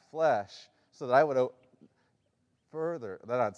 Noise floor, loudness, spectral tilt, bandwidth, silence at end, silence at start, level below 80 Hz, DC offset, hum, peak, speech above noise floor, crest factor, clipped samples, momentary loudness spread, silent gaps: -75 dBFS; -30 LUFS; -6 dB/octave; 10 kHz; 0.05 s; 0.15 s; -84 dBFS; under 0.1%; none; -10 dBFS; 46 dB; 22 dB; under 0.1%; 19 LU; none